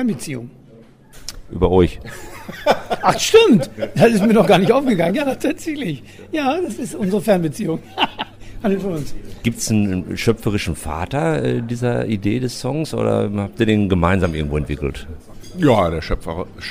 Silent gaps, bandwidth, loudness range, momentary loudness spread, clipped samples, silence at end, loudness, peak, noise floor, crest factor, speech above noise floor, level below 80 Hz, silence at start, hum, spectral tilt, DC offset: none; 16 kHz; 6 LU; 17 LU; under 0.1%; 0 s; -18 LUFS; -2 dBFS; -45 dBFS; 16 dB; 27 dB; -36 dBFS; 0 s; none; -5.5 dB/octave; under 0.1%